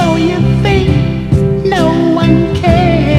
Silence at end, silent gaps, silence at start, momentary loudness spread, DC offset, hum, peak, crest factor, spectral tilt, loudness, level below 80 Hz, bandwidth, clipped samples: 0 s; none; 0 s; 3 LU; under 0.1%; none; 0 dBFS; 10 dB; -7.5 dB/octave; -11 LUFS; -22 dBFS; 11 kHz; 0.3%